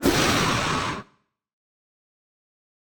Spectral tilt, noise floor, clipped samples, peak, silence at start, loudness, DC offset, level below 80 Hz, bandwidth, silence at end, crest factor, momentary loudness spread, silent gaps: -3.5 dB/octave; -64 dBFS; under 0.1%; -8 dBFS; 0 s; -22 LUFS; under 0.1%; -44 dBFS; over 20 kHz; 1.95 s; 20 dB; 11 LU; none